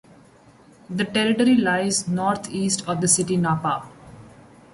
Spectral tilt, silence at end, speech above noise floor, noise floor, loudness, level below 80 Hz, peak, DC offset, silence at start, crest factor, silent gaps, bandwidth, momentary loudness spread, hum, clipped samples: -4 dB/octave; 0.45 s; 30 dB; -51 dBFS; -21 LUFS; -58 dBFS; -6 dBFS; under 0.1%; 0.9 s; 16 dB; none; 11.5 kHz; 9 LU; none; under 0.1%